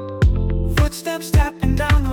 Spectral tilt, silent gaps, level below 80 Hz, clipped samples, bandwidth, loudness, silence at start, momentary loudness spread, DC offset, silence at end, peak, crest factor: -6 dB/octave; none; -20 dBFS; under 0.1%; 18 kHz; -19 LUFS; 0 s; 4 LU; under 0.1%; 0 s; -6 dBFS; 12 dB